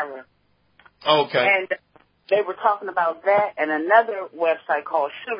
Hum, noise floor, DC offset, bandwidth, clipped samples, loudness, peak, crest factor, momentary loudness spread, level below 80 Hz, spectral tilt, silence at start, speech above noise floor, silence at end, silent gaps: none; -64 dBFS; under 0.1%; 5.4 kHz; under 0.1%; -21 LUFS; -4 dBFS; 18 dB; 11 LU; -76 dBFS; -8.5 dB/octave; 0 s; 43 dB; 0 s; none